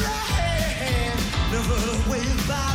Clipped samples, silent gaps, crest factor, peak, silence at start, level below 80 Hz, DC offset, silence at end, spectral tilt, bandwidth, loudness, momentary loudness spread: under 0.1%; none; 12 dB; -10 dBFS; 0 s; -28 dBFS; under 0.1%; 0 s; -4.5 dB/octave; 16.5 kHz; -24 LUFS; 1 LU